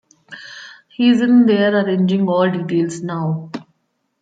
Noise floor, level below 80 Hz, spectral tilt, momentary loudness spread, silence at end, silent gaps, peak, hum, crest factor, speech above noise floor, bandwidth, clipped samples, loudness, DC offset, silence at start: -68 dBFS; -66 dBFS; -7 dB/octave; 22 LU; 0.6 s; none; -4 dBFS; none; 14 dB; 53 dB; 9 kHz; under 0.1%; -16 LUFS; under 0.1%; 0.3 s